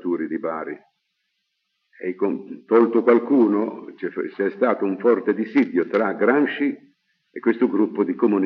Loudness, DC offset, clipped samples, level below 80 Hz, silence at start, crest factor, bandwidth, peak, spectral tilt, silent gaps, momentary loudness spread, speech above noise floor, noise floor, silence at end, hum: -21 LUFS; under 0.1%; under 0.1%; under -90 dBFS; 0.05 s; 18 dB; 5.4 kHz; -4 dBFS; -5.5 dB/octave; none; 14 LU; 54 dB; -74 dBFS; 0 s; none